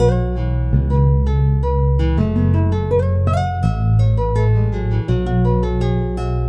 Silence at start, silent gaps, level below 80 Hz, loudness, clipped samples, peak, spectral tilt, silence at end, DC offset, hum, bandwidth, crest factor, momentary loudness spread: 0 s; none; -22 dBFS; -17 LUFS; under 0.1%; -2 dBFS; -9.5 dB/octave; 0 s; under 0.1%; none; 8.2 kHz; 14 dB; 4 LU